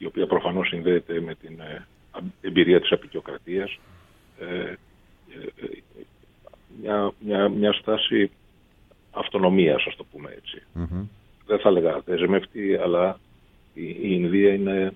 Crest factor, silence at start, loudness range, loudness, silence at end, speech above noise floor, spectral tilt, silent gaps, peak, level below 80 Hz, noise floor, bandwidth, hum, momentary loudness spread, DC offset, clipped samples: 22 dB; 0 s; 10 LU; -23 LUFS; 0 s; 34 dB; -8.5 dB/octave; none; -2 dBFS; -54 dBFS; -56 dBFS; 4 kHz; none; 20 LU; under 0.1%; under 0.1%